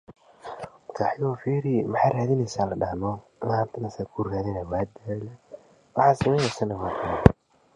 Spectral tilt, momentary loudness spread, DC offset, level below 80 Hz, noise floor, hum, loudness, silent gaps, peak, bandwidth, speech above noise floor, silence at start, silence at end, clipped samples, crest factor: -7 dB/octave; 18 LU; under 0.1%; -42 dBFS; -48 dBFS; none; -26 LUFS; none; 0 dBFS; 11 kHz; 24 dB; 0.1 s; 0.45 s; under 0.1%; 26 dB